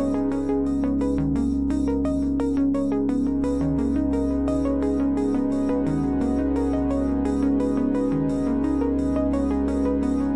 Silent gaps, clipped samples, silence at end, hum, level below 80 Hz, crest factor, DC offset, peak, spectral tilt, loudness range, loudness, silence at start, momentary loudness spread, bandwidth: none; under 0.1%; 0 s; none; -36 dBFS; 10 dB; 0.9%; -12 dBFS; -8.5 dB/octave; 0 LU; -23 LUFS; 0 s; 1 LU; 10.5 kHz